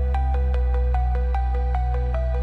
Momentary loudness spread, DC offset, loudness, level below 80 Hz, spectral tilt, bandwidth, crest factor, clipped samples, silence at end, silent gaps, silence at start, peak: 2 LU; under 0.1%; -24 LUFS; -22 dBFS; -9 dB/octave; 4.1 kHz; 8 dB; under 0.1%; 0 s; none; 0 s; -12 dBFS